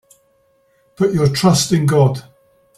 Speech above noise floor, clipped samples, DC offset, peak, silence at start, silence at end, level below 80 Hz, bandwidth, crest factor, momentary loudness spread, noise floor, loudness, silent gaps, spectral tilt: 44 dB; under 0.1%; under 0.1%; -2 dBFS; 1 s; 0.6 s; -48 dBFS; 14.5 kHz; 16 dB; 6 LU; -58 dBFS; -15 LUFS; none; -5.5 dB/octave